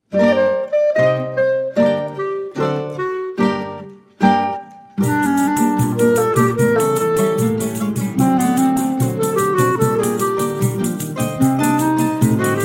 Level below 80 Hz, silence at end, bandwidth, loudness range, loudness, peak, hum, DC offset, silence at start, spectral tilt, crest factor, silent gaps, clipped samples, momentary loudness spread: -52 dBFS; 0 s; 16.5 kHz; 3 LU; -17 LUFS; -2 dBFS; none; under 0.1%; 0.1 s; -6 dB/octave; 16 dB; none; under 0.1%; 7 LU